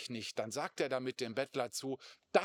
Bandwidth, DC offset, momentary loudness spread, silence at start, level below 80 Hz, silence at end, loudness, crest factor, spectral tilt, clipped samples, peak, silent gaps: 18.5 kHz; under 0.1%; 5 LU; 0 s; under -90 dBFS; 0 s; -39 LUFS; 26 dB; -3.5 dB/octave; under 0.1%; -12 dBFS; none